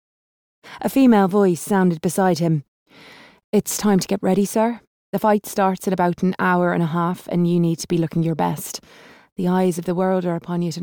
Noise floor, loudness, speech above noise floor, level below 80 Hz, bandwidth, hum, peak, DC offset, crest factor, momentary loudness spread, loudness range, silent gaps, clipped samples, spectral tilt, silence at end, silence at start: -46 dBFS; -20 LUFS; 27 dB; -58 dBFS; over 20 kHz; none; -6 dBFS; under 0.1%; 14 dB; 8 LU; 2 LU; 2.68-2.86 s, 3.44-3.53 s, 4.87-5.13 s, 9.32-9.36 s; under 0.1%; -6 dB/octave; 0 s; 0.65 s